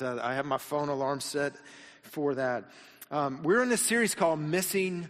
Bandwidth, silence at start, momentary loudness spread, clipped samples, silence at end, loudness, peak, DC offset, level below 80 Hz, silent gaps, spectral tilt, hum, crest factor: 15.5 kHz; 0 s; 14 LU; under 0.1%; 0 s; -29 LUFS; -12 dBFS; under 0.1%; -70 dBFS; none; -4 dB/octave; none; 18 dB